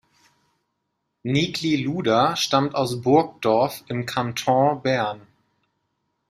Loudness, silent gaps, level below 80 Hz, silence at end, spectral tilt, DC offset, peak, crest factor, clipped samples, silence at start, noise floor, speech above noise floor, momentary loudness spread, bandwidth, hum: -22 LUFS; none; -60 dBFS; 1.1 s; -5 dB/octave; under 0.1%; -4 dBFS; 20 dB; under 0.1%; 1.25 s; -77 dBFS; 55 dB; 7 LU; 15.5 kHz; none